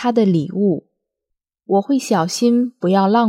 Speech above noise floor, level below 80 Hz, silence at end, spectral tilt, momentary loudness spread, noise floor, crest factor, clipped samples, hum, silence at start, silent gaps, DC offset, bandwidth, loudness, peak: 63 dB; -70 dBFS; 0 s; -6 dB/octave; 4 LU; -79 dBFS; 14 dB; under 0.1%; none; 0 s; none; under 0.1%; 14.5 kHz; -17 LUFS; -2 dBFS